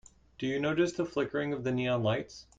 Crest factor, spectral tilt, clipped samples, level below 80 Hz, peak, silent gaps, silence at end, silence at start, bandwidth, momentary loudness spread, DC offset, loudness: 16 dB; -6 dB/octave; under 0.1%; -62 dBFS; -16 dBFS; none; 0.15 s; 0.4 s; 9.2 kHz; 5 LU; under 0.1%; -32 LUFS